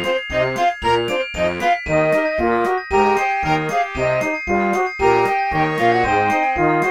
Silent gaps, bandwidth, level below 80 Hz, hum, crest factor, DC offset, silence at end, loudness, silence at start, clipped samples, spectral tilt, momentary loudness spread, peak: none; 16 kHz; -40 dBFS; none; 14 dB; 0.1%; 0 s; -18 LUFS; 0 s; under 0.1%; -5.5 dB/octave; 4 LU; -4 dBFS